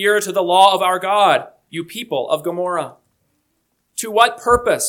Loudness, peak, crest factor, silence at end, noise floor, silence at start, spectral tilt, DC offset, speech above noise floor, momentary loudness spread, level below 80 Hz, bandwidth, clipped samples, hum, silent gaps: -16 LUFS; 0 dBFS; 18 dB; 0 s; -68 dBFS; 0 s; -2.5 dB/octave; under 0.1%; 52 dB; 16 LU; -48 dBFS; 19 kHz; under 0.1%; none; none